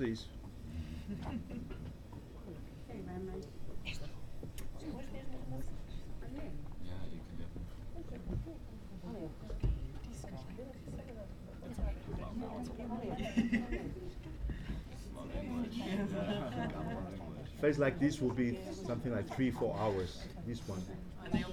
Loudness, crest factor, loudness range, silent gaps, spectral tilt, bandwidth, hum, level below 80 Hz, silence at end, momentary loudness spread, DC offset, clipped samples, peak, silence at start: -41 LUFS; 20 dB; 11 LU; none; -7 dB/octave; 17.5 kHz; none; -48 dBFS; 0 s; 14 LU; under 0.1%; under 0.1%; -20 dBFS; 0 s